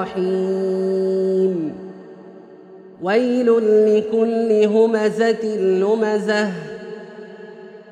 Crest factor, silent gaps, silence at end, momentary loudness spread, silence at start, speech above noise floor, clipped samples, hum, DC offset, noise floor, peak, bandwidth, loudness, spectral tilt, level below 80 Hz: 14 dB; none; 0 s; 21 LU; 0 s; 24 dB; under 0.1%; none; under 0.1%; -41 dBFS; -4 dBFS; 9.6 kHz; -18 LUFS; -6.5 dB/octave; -68 dBFS